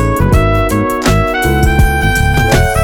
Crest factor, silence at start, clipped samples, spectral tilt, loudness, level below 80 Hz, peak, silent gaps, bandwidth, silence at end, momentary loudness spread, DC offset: 10 dB; 0 s; under 0.1%; -5.5 dB/octave; -11 LUFS; -16 dBFS; 0 dBFS; none; 20 kHz; 0 s; 2 LU; under 0.1%